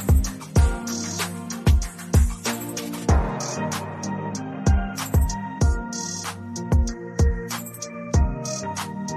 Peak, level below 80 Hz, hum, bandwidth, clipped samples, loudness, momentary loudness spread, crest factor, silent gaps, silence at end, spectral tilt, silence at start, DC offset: -6 dBFS; -26 dBFS; none; 14 kHz; under 0.1%; -25 LUFS; 8 LU; 16 dB; none; 0 s; -5 dB/octave; 0 s; under 0.1%